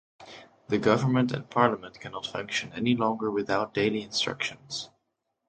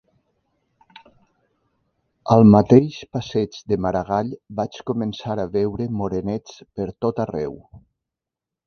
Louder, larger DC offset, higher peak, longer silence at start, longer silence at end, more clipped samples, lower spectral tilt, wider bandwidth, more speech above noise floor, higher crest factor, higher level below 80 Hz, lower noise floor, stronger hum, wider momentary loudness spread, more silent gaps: second, -28 LUFS vs -20 LUFS; neither; second, -6 dBFS vs 0 dBFS; second, 0.2 s vs 2.25 s; second, 0.6 s vs 0.9 s; neither; second, -5 dB/octave vs -8.5 dB/octave; first, 9.2 kHz vs 6.6 kHz; second, 52 dB vs 67 dB; about the same, 24 dB vs 22 dB; second, -64 dBFS vs -48 dBFS; second, -80 dBFS vs -87 dBFS; neither; about the same, 16 LU vs 17 LU; neither